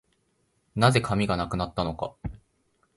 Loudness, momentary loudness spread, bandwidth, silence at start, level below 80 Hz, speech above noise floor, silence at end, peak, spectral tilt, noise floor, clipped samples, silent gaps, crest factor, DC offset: -26 LUFS; 16 LU; 11.5 kHz; 0.75 s; -46 dBFS; 46 dB; 0.6 s; -4 dBFS; -6 dB/octave; -71 dBFS; under 0.1%; none; 24 dB; under 0.1%